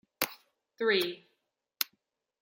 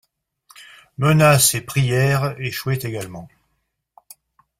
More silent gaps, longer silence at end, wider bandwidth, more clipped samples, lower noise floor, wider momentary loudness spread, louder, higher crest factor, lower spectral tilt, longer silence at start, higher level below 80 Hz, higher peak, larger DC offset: neither; second, 0.6 s vs 1.35 s; about the same, 16.5 kHz vs 16 kHz; neither; first, -80 dBFS vs -72 dBFS; second, 8 LU vs 19 LU; second, -32 LUFS vs -18 LUFS; first, 32 dB vs 20 dB; second, -2 dB/octave vs -4.5 dB/octave; second, 0.2 s vs 0.6 s; second, -80 dBFS vs -52 dBFS; second, -4 dBFS vs 0 dBFS; neither